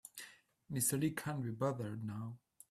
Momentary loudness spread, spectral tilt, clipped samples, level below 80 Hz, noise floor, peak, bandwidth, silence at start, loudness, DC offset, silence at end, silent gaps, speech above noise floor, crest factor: 18 LU; -5 dB/octave; under 0.1%; -74 dBFS; -59 dBFS; -22 dBFS; 15.5 kHz; 0.05 s; -39 LUFS; under 0.1%; 0.35 s; none; 20 dB; 18 dB